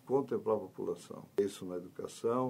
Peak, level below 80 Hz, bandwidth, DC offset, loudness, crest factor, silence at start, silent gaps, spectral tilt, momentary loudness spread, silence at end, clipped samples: -20 dBFS; -78 dBFS; 16 kHz; under 0.1%; -37 LUFS; 16 dB; 0.05 s; none; -6.5 dB/octave; 9 LU; 0 s; under 0.1%